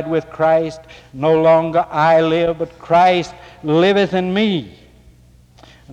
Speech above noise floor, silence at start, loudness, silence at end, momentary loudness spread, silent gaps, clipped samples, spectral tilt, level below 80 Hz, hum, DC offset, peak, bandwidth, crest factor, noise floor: 32 dB; 0 s; -16 LUFS; 0 s; 12 LU; none; under 0.1%; -6.5 dB/octave; -50 dBFS; none; under 0.1%; -4 dBFS; 9 kHz; 12 dB; -47 dBFS